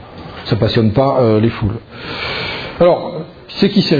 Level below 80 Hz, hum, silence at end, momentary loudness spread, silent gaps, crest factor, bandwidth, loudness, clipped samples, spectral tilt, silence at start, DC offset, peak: -40 dBFS; none; 0 s; 15 LU; none; 16 dB; 5 kHz; -15 LUFS; under 0.1%; -8 dB/octave; 0 s; under 0.1%; 0 dBFS